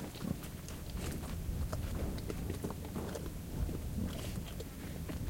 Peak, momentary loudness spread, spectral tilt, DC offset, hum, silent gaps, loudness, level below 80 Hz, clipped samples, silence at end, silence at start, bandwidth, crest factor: -22 dBFS; 5 LU; -6 dB/octave; under 0.1%; none; none; -42 LUFS; -44 dBFS; under 0.1%; 0 s; 0 s; 17 kHz; 18 dB